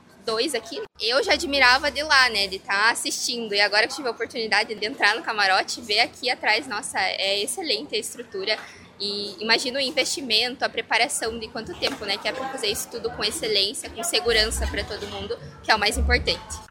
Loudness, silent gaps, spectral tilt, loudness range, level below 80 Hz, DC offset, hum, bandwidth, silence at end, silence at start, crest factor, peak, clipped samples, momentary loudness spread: -22 LUFS; none; -2 dB/octave; 5 LU; -40 dBFS; under 0.1%; none; 17 kHz; 0.05 s; 0.25 s; 22 dB; -2 dBFS; under 0.1%; 10 LU